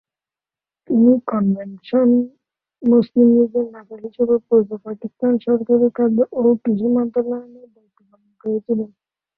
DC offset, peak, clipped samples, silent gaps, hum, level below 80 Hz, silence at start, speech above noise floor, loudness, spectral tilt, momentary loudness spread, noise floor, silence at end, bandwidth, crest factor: under 0.1%; -2 dBFS; under 0.1%; none; none; -62 dBFS; 0.9 s; over 73 dB; -18 LUFS; -12 dB/octave; 15 LU; under -90 dBFS; 0.5 s; 4.4 kHz; 16 dB